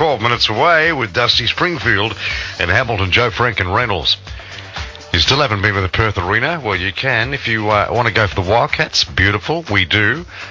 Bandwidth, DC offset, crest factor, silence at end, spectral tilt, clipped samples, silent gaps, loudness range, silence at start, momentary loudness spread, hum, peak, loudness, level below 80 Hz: 7.6 kHz; under 0.1%; 16 dB; 0 s; -4.5 dB/octave; under 0.1%; none; 2 LU; 0 s; 7 LU; none; 0 dBFS; -15 LUFS; -32 dBFS